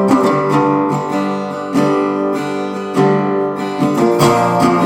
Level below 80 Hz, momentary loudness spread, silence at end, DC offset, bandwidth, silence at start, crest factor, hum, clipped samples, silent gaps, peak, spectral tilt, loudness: -50 dBFS; 7 LU; 0 s; under 0.1%; 17.5 kHz; 0 s; 14 dB; none; under 0.1%; none; 0 dBFS; -6.5 dB/octave; -15 LUFS